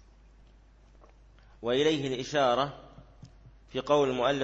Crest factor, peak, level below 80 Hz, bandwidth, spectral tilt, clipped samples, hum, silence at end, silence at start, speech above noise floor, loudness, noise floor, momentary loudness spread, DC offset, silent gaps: 20 dB; -10 dBFS; -56 dBFS; 8 kHz; -5 dB/octave; under 0.1%; none; 0 s; 1.65 s; 30 dB; -28 LUFS; -57 dBFS; 12 LU; under 0.1%; none